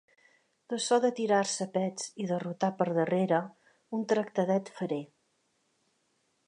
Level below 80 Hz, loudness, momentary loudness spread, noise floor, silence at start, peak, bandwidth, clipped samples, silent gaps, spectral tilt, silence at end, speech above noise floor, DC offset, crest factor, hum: -82 dBFS; -30 LUFS; 10 LU; -75 dBFS; 0.7 s; -12 dBFS; 11 kHz; under 0.1%; none; -5 dB/octave; 1.45 s; 45 dB; under 0.1%; 20 dB; none